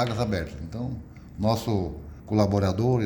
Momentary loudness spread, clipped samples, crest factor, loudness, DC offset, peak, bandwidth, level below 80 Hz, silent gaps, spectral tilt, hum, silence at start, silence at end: 13 LU; under 0.1%; 16 dB; -27 LUFS; under 0.1%; -10 dBFS; over 20 kHz; -44 dBFS; none; -7.5 dB/octave; none; 0 s; 0 s